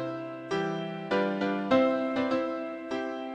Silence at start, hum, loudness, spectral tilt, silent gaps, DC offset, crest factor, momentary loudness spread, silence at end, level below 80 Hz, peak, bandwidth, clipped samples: 0 s; none; -30 LUFS; -6.5 dB/octave; none; under 0.1%; 18 dB; 10 LU; 0 s; -68 dBFS; -10 dBFS; 8.8 kHz; under 0.1%